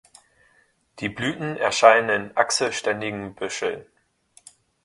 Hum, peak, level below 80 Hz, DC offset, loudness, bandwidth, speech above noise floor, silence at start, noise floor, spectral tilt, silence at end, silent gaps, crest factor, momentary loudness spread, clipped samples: none; 0 dBFS; -62 dBFS; under 0.1%; -22 LUFS; 11.5 kHz; 41 dB; 0.95 s; -63 dBFS; -3 dB/octave; 1 s; none; 24 dB; 15 LU; under 0.1%